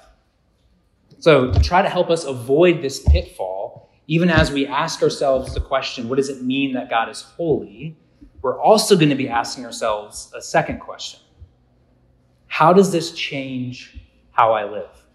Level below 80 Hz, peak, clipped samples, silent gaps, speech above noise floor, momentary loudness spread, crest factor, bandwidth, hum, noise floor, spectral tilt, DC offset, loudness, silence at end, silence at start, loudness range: -32 dBFS; 0 dBFS; under 0.1%; none; 43 dB; 15 LU; 20 dB; 13 kHz; none; -61 dBFS; -5.5 dB/octave; under 0.1%; -19 LUFS; 0.3 s; 1.2 s; 4 LU